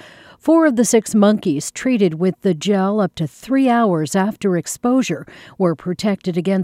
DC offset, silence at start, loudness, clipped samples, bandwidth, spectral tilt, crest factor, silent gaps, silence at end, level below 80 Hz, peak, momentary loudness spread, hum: under 0.1%; 0.05 s; -17 LUFS; under 0.1%; 16 kHz; -5.5 dB/octave; 14 dB; none; 0 s; -58 dBFS; -2 dBFS; 7 LU; none